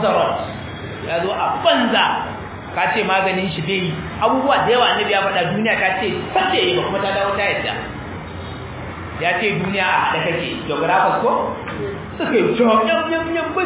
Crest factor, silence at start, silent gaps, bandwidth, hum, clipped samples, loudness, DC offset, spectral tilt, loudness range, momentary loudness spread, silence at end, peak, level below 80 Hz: 16 dB; 0 s; none; 4 kHz; none; under 0.1%; -18 LUFS; under 0.1%; -9 dB/octave; 4 LU; 14 LU; 0 s; -2 dBFS; -44 dBFS